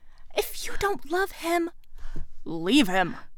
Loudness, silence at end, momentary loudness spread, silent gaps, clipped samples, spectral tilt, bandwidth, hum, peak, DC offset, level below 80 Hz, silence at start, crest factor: -27 LUFS; 0 s; 21 LU; none; under 0.1%; -4 dB/octave; over 20 kHz; none; -6 dBFS; under 0.1%; -40 dBFS; 0 s; 20 dB